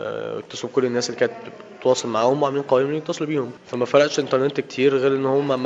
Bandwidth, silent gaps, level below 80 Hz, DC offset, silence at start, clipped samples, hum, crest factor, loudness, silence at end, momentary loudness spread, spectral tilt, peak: 8.2 kHz; none; -66 dBFS; under 0.1%; 0 s; under 0.1%; none; 20 dB; -21 LUFS; 0 s; 11 LU; -5 dB/octave; -2 dBFS